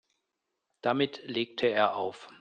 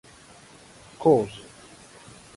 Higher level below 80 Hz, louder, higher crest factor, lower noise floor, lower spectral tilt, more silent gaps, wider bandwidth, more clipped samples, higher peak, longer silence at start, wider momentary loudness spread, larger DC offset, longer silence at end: second, -74 dBFS vs -60 dBFS; second, -30 LUFS vs -23 LUFS; about the same, 22 dB vs 22 dB; first, -84 dBFS vs -50 dBFS; about the same, -6 dB/octave vs -7 dB/octave; neither; second, 9.2 kHz vs 11.5 kHz; neither; second, -10 dBFS vs -6 dBFS; second, 0.85 s vs 1 s; second, 8 LU vs 26 LU; neither; second, 0.1 s vs 1 s